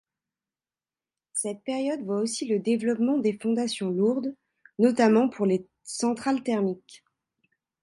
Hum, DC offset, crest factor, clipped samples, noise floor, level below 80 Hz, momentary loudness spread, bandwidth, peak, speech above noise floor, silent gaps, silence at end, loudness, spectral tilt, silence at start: none; under 0.1%; 18 dB; under 0.1%; under -90 dBFS; -74 dBFS; 10 LU; 11.5 kHz; -8 dBFS; over 65 dB; none; 0.85 s; -26 LUFS; -5 dB/octave; 1.35 s